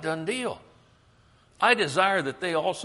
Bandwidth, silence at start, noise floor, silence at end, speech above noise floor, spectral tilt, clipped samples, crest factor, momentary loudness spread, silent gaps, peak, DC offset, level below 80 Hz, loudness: 11.5 kHz; 0 s; -60 dBFS; 0 s; 34 dB; -3.5 dB/octave; under 0.1%; 22 dB; 11 LU; none; -6 dBFS; under 0.1%; -66 dBFS; -25 LUFS